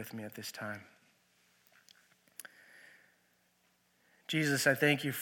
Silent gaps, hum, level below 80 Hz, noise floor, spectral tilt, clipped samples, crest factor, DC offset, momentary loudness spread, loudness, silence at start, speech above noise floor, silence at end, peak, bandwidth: none; 60 Hz at -85 dBFS; -84 dBFS; -73 dBFS; -4 dB/octave; under 0.1%; 24 dB; under 0.1%; 24 LU; -32 LUFS; 0 s; 40 dB; 0 s; -14 dBFS; 17.5 kHz